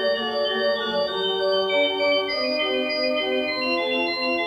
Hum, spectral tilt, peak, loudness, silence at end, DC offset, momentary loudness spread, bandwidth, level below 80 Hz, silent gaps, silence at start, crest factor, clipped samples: none; -4 dB/octave; -10 dBFS; -22 LUFS; 0 s; under 0.1%; 3 LU; 15.5 kHz; -60 dBFS; none; 0 s; 14 dB; under 0.1%